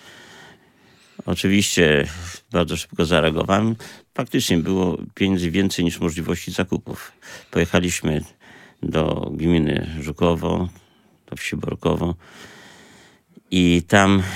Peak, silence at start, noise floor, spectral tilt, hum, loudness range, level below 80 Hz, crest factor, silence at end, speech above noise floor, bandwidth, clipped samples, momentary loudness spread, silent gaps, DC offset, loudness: 0 dBFS; 0.05 s; -54 dBFS; -5 dB/octave; none; 4 LU; -46 dBFS; 22 dB; 0 s; 33 dB; 16.5 kHz; under 0.1%; 16 LU; none; under 0.1%; -21 LUFS